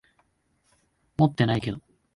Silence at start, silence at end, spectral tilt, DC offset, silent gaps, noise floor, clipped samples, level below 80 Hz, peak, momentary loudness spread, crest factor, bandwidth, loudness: 1.2 s; 0.35 s; -8 dB/octave; under 0.1%; none; -70 dBFS; under 0.1%; -54 dBFS; -8 dBFS; 16 LU; 20 dB; 11.5 kHz; -25 LUFS